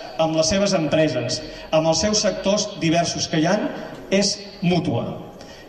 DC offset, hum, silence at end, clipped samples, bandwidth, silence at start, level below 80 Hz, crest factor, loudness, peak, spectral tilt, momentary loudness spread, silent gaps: under 0.1%; none; 0 s; under 0.1%; 11 kHz; 0 s; -46 dBFS; 14 dB; -21 LUFS; -8 dBFS; -4 dB/octave; 9 LU; none